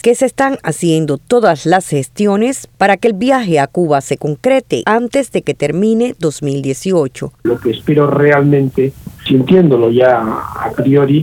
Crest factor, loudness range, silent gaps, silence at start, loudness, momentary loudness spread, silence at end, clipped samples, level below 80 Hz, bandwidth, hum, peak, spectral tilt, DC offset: 12 dB; 3 LU; none; 0.05 s; -13 LUFS; 8 LU; 0 s; under 0.1%; -48 dBFS; 17 kHz; none; 0 dBFS; -6 dB/octave; under 0.1%